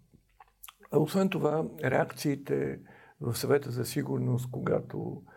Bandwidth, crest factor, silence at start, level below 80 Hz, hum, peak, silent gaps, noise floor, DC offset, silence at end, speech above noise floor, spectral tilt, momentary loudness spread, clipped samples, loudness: 17 kHz; 20 dB; 0.65 s; -66 dBFS; none; -10 dBFS; none; -61 dBFS; under 0.1%; 0.15 s; 31 dB; -6.5 dB/octave; 11 LU; under 0.1%; -31 LUFS